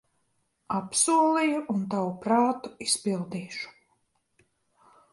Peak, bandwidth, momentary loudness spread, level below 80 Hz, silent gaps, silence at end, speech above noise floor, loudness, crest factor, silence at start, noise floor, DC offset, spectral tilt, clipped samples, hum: -10 dBFS; 11.5 kHz; 13 LU; -72 dBFS; none; 1.45 s; 47 dB; -26 LUFS; 18 dB; 0.7 s; -73 dBFS; under 0.1%; -3.5 dB/octave; under 0.1%; none